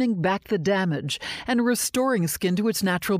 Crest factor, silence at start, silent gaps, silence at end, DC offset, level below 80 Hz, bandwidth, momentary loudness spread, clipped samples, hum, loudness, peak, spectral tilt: 12 dB; 0 s; none; 0 s; under 0.1%; -56 dBFS; 16 kHz; 4 LU; under 0.1%; none; -24 LUFS; -12 dBFS; -4.5 dB/octave